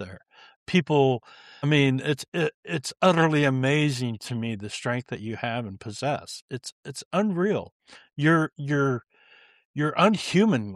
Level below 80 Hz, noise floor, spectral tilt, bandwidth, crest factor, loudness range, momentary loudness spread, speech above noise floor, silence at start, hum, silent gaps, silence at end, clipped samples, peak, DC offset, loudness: -66 dBFS; -57 dBFS; -6 dB/octave; 13 kHz; 18 dB; 6 LU; 15 LU; 32 dB; 0 s; none; 0.56-0.66 s, 2.28-2.32 s, 2.54-2.63 s, 6.42-6.48 s, 6.72-6.83 s, 7.05-7.11 s, 7.72-7.80 s, 9.65-9.74 s; 0 s; under 0.1%; -8 dBFS; under 0.1%; -25 LUFS